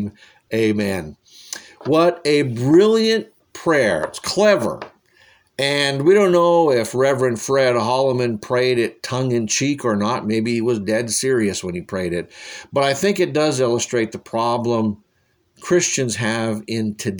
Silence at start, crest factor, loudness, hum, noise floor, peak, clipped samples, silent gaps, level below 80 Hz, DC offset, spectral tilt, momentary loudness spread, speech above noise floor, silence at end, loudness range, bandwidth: 0 s; 16 dB; -18 LUFS; none; -64 dBFS; -4 dBFS; under 0.1%; none; -58 dBFS; under 0.1%; -4.5 dB/octave; 12 LU; 45 dB; 0 s; 4 LU; over 20 kHz